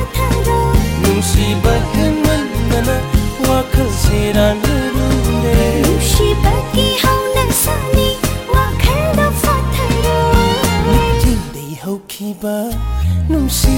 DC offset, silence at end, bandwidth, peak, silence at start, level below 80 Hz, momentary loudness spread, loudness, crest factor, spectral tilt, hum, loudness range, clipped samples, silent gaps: under 0.1%; 0 s; 17 kHz; -2 dBFS; 0 s; -18 dBFS; 7 LU; -14 LUFS; 12 dB; -5 dB/octave; none; 2 LU; under 0.1%; none